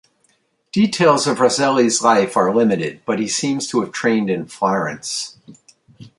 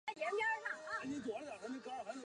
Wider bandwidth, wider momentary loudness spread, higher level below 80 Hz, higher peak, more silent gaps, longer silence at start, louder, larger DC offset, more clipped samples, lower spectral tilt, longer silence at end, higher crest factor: about the same, 11.5 kHz vs 11 kHz; about the same, 9 LU vs 9 LU; first, -62 dBFS vs -80 dBFS; first, -2 dBFS vs -28 dBFS; neither; first, 0.75 s vs 0.05 s; first, -17 LUFS vs -42 LUFS; neither; neither; about the same, -4 dB/octave vs -3.5 dB/octave; about the same, 0.1 s vs 0 s; about the same, 16 dB vs 14 dB